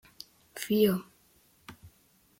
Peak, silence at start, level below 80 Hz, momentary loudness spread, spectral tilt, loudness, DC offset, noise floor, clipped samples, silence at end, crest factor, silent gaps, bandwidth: -12 dBFS; 0.55 s; -68 dBFS; 25 LU; -5.5 dB/octave; -29 LUFS; under 0.1%; -65 dBFS; under 0.1%; 0.5 s; 20 dB; none; 16.5 kHz